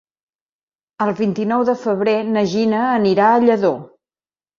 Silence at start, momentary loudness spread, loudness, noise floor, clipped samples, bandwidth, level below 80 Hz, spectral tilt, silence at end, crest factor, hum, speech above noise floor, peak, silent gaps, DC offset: 1 s; 7 LU; -17 LUFS; under -90 dBFS; under 0.1%; 7.4 kHz; -60 dBFS; -7 dB/octave; 0.75 s; 16 dB; none; over 74 dB; -2 dBFS; none; under 0.1%